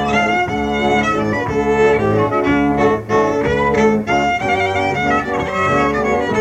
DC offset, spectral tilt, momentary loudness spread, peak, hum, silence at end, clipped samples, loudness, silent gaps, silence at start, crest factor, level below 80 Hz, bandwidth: 0.2%; -6 dB/octave; 3 LU; -2 dBFS; none; 0 s; under 0.1%; -16 LUFS; none; 0 s; 12 dB; -38 dBFS; 11 kHz